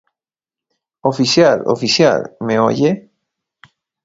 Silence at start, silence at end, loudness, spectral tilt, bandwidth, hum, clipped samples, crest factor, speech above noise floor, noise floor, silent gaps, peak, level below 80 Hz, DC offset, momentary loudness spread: 1.05 s; 1.05 s; -15 LUFS; -4.5 dB/octave; 8 kHz; none; under 0.1%; 16 dB; 75 dB; -89 dBFS; none; 0 dBFS; -58 dBFS; under 0.1%; 9 LU